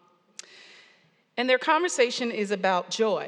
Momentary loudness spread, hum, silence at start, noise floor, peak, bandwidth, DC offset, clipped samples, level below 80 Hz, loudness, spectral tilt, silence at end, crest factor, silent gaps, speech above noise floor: 23 LU; none; 1.35 s; -62 dBFS; -8 dBFS; 11.5 kHz; under 0.1%; under 0.1%; under -90 dBFS; -25 LUFS; -3 dB/octave; 0 s; 20 dB; none; 37 dB